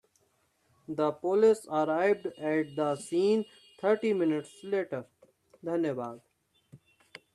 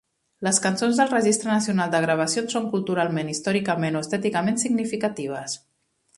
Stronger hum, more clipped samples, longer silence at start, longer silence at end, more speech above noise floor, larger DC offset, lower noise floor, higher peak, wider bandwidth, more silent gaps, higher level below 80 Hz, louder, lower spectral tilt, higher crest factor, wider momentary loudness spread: neither; neither; first, 0.9 s vs 0.4 s; about the same, 0.6 s vs 0.6 s; about the same, 43 dB vs 43 dB; neither; first, -72 dBFS vs -66 dBFS; second, -14 dBFS vs -4 dBFS; about the same, 12 kHz vs 11.5 kHz; neither; second, -78 dBFS vs -66 dBFS; second, -30 LUFS vs -23 LUFS; first, -6 dB/octave vs -4 dB/octave; about the same, 18 dB vs 20 dB; first, 13 LU vs 8 LU